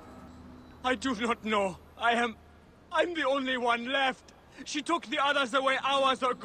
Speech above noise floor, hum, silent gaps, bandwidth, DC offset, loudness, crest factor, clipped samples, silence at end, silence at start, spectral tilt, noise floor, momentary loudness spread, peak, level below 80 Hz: 22 dB; none; none; 12 kHz; under 0.1%; -29 LUFS; 18 dB; under 0.1%; 0 s; 0 s; -3 dB/octave; -51 dBFS; 10 LU; -14 dBFS; -62 dBFS